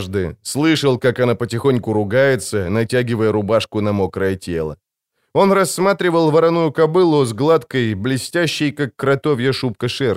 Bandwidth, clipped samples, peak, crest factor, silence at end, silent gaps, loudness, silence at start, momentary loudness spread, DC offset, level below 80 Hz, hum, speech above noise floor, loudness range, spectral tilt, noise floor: 16 kHz; under 0.1%; -2 dBFS; 14 dB; 0 s; none; -17 LUFS; 0 s; 7 LU; under 0.1%; -50 dBFS; none; 55 dB; 3 LU; -5.5 dB/octave; -71 dBFS